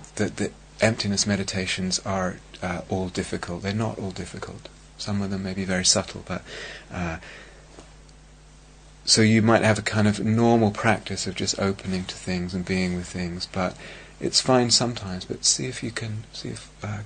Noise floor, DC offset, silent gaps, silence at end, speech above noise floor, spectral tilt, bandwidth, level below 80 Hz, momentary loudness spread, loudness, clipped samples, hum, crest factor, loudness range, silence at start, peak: -49 dBFS; under 0.1%; none; 0 s; 24 dB; -4 dB/octave; 9.6 kHz; -50 dBFS; 16 LU; -24 LUFS; under 0.1%; none; 22 dB; 7 LU; 0 s; -2 dBFS